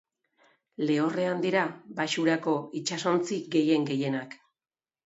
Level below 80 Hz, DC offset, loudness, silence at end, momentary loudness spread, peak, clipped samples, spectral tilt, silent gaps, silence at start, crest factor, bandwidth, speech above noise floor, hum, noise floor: -78 dBFS; under 0.1%; -28 LUFS; 0.7 s; 7 LU; -10 dBFS; under 0.1%; -5 dB/octave; none; 0.8 s; 18 dB; 8 kHz; over 62 dB; none; under -90 dBFS